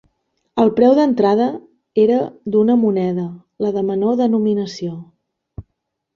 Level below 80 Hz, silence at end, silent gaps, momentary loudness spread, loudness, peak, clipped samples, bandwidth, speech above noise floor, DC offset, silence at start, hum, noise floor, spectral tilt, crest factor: -54 dBFS; 0.55 s; none; 14 LU; -17 LUFS; -2 dBFS; under 0.1%; 7 kHz; 59 dB; under 0.1%; 0.55 s; none; -75 dBFS; -8 dB/octave; 16 dB